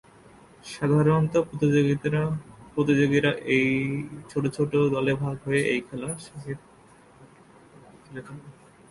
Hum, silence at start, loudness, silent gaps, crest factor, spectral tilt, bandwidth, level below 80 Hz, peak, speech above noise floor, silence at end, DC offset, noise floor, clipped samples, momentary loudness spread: none; 0.65 s; -25 LUFS; none; 18 dB; -6.5 dB/octave; 11.5 kHz; -56 dBFS; -8 dBFS; 29 dB; 0.4 s; under 0.1%; -54 dBFS; under 0.1%; 19 LU